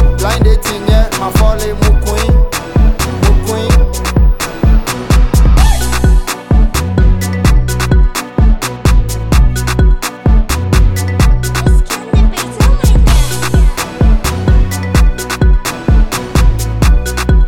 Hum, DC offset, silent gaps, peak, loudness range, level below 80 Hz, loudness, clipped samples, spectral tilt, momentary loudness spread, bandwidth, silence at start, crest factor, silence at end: none; under 0.1%; none; 0 dBFS; 1 LU; -10 dBFS; -12 LUFS; under 0.1%; -5.5 dB/octave; 3 LU; 17.5 kHz; 0 s; 8 dB; 0 s